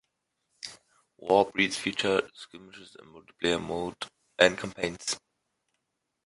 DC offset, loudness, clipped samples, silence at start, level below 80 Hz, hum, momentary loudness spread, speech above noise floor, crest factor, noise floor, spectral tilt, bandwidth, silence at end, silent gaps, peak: under 0.1%; -28 LUFS; under 0.1%; 0.65 s; -62 dBFS; none; 22 LU; 53 dB; 28 dB; -82 dBFS; -3 dB/octave; 11.5 kHz; 1.1 s; none; -2 dBFS